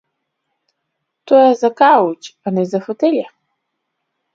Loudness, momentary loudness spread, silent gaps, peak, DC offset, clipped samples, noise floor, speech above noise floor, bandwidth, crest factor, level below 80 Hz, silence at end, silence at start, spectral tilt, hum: -14 LUFS; 11 LU; none; 0 dBFS; under 0.1%; under 0.1%; -74 dBFS; 61 dB; 7.6 kHz; 16 dB; -68 dBFS; 1.05 s; 1.25 s; -6.5 dB/octave; none